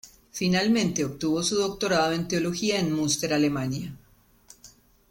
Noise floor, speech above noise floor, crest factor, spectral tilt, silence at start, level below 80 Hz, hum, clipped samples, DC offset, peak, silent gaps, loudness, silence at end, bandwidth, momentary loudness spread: -59 dBFS; 34 dB; 14 dB; -4 dB/octave; 0.05 s; -56 dBFS; none; under 0.1%; under 0.1%; -12 dBFS; none; -25 LUFS; 0.45 s; 17 kHz; 7 LU